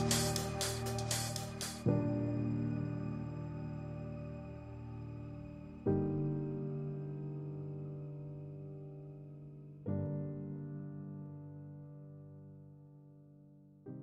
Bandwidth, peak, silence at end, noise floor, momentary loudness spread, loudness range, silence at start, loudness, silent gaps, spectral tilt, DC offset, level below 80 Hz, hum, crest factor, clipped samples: 15 kHz; -18 dBFS; 0 s; -60 dBFS; 19 LU; 9 LU; 0 s; -40 LUFS; none; -5 dB/octave; under 0.1%; -60 dBFS; none; 22 dB; under 0.1%